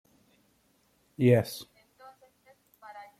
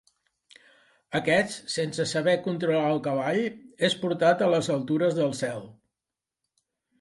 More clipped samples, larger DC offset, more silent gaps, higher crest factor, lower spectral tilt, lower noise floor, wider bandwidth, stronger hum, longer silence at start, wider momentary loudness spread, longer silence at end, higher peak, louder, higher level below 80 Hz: neither; neither; neither; about the same, 22 dB vs 20 dB; first, -7 dB/octave vs -5 dB/octave; second, -69 dBFS vs -89 dBFS; first, 16 kHz vs 11.5 kHz; neither; about the same, 1.2 s vs 1.1 s; first, 27 LU vs 7 LU; second, 0.2 s vs 1.3 s; about the same, -10 dBFS vs -8 dBFS; about the same, -26 LUFS vs -26 LUFS; about the same, -72 dBFS vs -68 dBFS